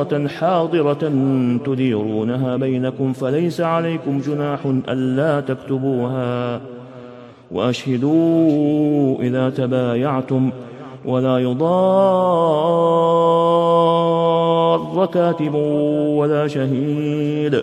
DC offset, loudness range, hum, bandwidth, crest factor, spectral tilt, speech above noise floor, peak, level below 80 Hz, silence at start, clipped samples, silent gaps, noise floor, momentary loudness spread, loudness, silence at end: under 0.1%; 6 LU; none; 12 kHz; 14 dB; -8 dB/octave; 21 dB; -4 dBFS; -62 dBFS; 0 s; under 0.1%; none; -39 dBFS; 7 LU; -18 LUFS; 0 s